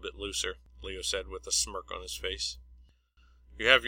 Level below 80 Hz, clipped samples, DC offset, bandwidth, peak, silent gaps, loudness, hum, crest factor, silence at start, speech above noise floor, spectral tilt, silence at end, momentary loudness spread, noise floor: -50 dBFS; under 0.1%; under 0.1%; 16.5 kHz; -4 dBFS; none; -32 LUFS; none; 30 dB; 0 s; 31 dB; -0.5 dB/octave; 0 s; 11 LU; -63 dBFS